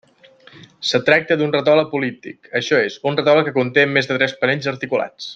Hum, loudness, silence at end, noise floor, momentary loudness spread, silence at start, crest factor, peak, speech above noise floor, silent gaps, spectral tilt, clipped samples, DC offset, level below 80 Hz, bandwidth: none; -17 LUFS; 0 s; -48 dBFS; 8 LU; 0.55 s; 16 dB; -2 dBFS; 31 dB; none; -5 dB/octave; under 0.1%; under 0.1%; -62 dBFS; 7.8 kHz